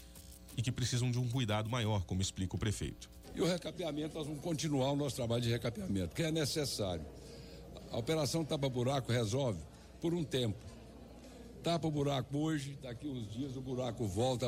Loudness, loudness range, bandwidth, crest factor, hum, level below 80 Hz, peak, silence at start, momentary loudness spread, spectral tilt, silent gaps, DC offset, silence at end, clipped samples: -37 LUFS; 2 LU; 16 kHz; 12 dB; none; -56 dBFS; -24 dBFS; 0 s; 17 LU; -5.5 dB/octave; none; under 0.1%; 0 s; under 0.1%